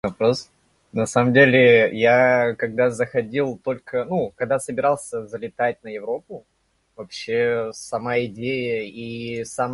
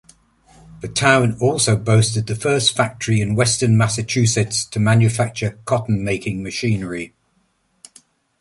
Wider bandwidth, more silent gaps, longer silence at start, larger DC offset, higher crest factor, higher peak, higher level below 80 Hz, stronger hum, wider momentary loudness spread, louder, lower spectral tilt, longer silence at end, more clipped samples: about the same, 11.5 kHz vs 11.5 kHz; neither; second, 0.05 s vs 0.7 s; neither; about the same, 20 dB vs 18 dB; about the same, -2 dBFS vs -2 dBFS; second, -58 dBFS vs -46 dBFS; neither; first, 16 LU vs 9 LU; second, -21 LUFS vs -18 LUFS; about the same, -5.5 dB/octave vs -4.5 dB/octave; second, 0 s vs 1.35 s; neither